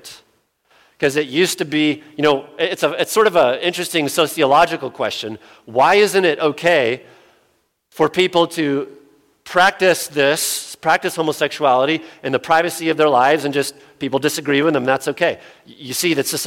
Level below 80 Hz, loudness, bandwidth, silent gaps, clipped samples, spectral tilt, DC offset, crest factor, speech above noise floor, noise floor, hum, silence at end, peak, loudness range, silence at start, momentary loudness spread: -60 dBFS; -17 LUFS; 17 kHz; none; under 0.1%; -3.5 dB/octave; under 0.1%; 16 dB; 46 dB; -63 dBFS; none; 0 s; -2 dBFS; 2 LU; 0.05 s; 9 LU